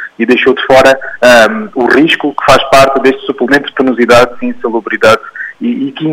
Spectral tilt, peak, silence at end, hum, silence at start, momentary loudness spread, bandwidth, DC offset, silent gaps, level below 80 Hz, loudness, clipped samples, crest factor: -4 dB/octave; 0 dBFS; 0 s; none; 0 s; 10 LU; 16.5 kHz; under 0.1%; none; -36 dBFS; -8 LUFS; 1%; 8 dB